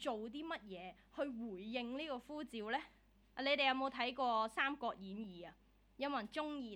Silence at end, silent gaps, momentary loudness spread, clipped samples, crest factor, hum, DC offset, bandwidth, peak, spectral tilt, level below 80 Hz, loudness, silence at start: 0 s; none; 16 LU; under 0.1%; 22 dB; none; under 0.1%; 18 kHz; -20 dBFS; -4.5 dB/octave; -72 dBFS; -41 LUFS; 0 s